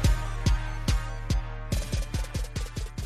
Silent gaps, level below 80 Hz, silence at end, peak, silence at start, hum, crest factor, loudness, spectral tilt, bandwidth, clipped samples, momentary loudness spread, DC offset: none; -30 dBFS; 0 s; -12 dBFS; 0 s; none; 16 dB; -31 LUFS; -5 dB/octave; 13.5 kHz; under 0.1%; 6 LU; under 0.1%